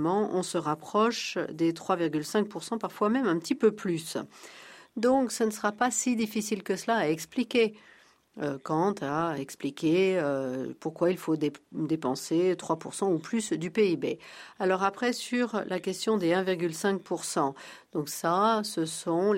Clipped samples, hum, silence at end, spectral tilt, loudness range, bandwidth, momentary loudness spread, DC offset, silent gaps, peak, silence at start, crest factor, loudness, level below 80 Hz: under 0.1%; none; 0 s; -4.5 dB/octave; 1 LU; 16 kHz; 9 LU; under 0.1%; none; -12 dBFS; 0 s; 18 dB; -29 LUFS; -72 dBFS